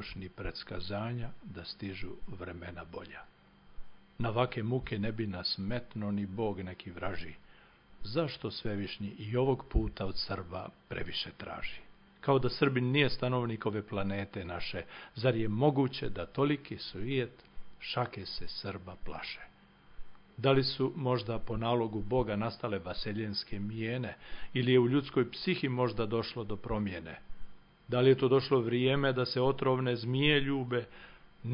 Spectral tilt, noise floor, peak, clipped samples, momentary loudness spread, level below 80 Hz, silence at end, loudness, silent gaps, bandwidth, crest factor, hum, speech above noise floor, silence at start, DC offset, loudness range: -10 dB/octave; -58 dBFS; -12 dBFS; under 0.1%; 16 LU; -50 dBFS; 0 s; -33 LUFS; none; 5.4 kHz; 20 dB; none; 25 dB; 0 s; under 0.1%; 8 LU